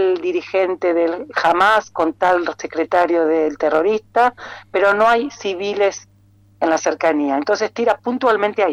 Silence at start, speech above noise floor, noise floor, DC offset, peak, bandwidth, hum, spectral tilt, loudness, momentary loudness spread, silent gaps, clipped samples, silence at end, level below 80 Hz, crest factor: 0 s; 27 dB; -45 dBFS; under 0.1%; -6 dBFS; 12 kHz; none; -4 dB/octave; -18 LUFS; 8 LU; none; under 0.1%; 0 s; -58 dBFS; 12 dB